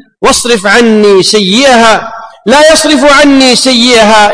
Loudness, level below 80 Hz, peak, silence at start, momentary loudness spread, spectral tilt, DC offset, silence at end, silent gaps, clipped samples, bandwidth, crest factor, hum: -4 LUFS; -34 dBFS; 0 dBFS; 0.2 s; 5 LU; -2.5 dB/octave; under 0.1%; 0 s; none; 6%; 11 kHz; 4 dB; none